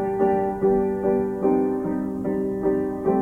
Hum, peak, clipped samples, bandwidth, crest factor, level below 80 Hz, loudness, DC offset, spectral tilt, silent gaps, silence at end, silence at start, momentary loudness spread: none; -8 dBFS; under 0.1%; 3 kHz; 14 dB; -48 dBFS; -23 LUFS; under 0.1%; -10 dB/octave; none; 0 s; 0 s; 4 LU